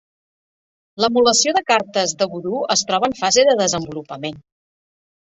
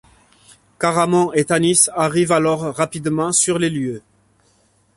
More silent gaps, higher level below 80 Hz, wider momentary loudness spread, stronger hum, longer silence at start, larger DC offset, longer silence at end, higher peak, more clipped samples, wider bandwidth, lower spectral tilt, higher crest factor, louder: neither; about the same, -58 dBFS vs -56 dBFS; first, 15 LU vs 8 LU; neither; first, 0.95 s vs 0.8 s; neither; about the same, 1 s vs 0.95 s; about the same, -2 dBFS vs 0 dBFS; neither; second, 8.4 kHz vs 11.5 kHz; second, -2 dB/octave vs -4 dB/octave; about the same, 18 dB vs 18 dB; about the same, -17 LUFS vs -17 LUFS